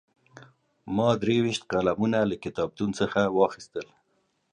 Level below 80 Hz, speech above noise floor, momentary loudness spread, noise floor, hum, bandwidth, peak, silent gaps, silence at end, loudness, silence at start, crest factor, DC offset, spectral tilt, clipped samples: -58 dBFS; 46 dB; 13 LU; -72 dBFS; none; 10.5 kHz; -8 dBFS; none; 0.7 s; -26 LUFS; 0.35 s; 20 dB; under 0.1%; -6 dB/octave; under 0.1%